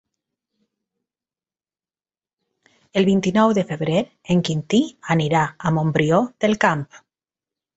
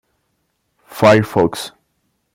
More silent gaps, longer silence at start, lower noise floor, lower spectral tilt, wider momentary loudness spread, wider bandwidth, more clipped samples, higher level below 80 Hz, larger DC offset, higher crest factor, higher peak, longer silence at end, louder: neither; first, 2.95 s vs 0.95 s; first, under -90 dBFS vs -68 dBFS; about the same, -6.5 dB/octave vs -6 dB/octave; second, 4 LU vs 19 LU; second, 8.2 kHz vs 16.5 kHz; neither; about the same, -56 dBFS vs -52 dBFS; neither; about the same, 20 dB vs 18 dB; about the same, -2 dBFS vs 0 dBFS; first, 0.8 s vs 0.65 s; second, -20 LUFS vs -14 LUFS